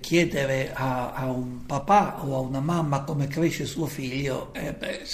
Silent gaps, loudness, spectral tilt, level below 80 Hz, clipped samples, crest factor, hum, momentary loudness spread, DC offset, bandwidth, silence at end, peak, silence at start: none; -27 LUFS; -6 dB/octave; -48 dBFS; under 0.1%; 18 dB; none; 10 LU; under 0.1%; 15.5 kHz; 0 s; -8 dBFS; 0 s